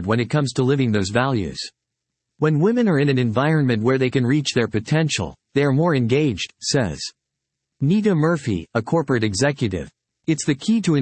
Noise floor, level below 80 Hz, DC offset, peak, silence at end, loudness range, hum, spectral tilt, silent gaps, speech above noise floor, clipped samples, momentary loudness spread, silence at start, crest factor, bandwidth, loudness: -81 dBFS; -52 dBFS; under 0.1%; -4 dBFS; 0 s; 2 LU; none; -6 dB/octave; none; 61 dB; under 0.1%; 8 LU; 0 s; 16 dB; 8.8 kHz; -20 LUFS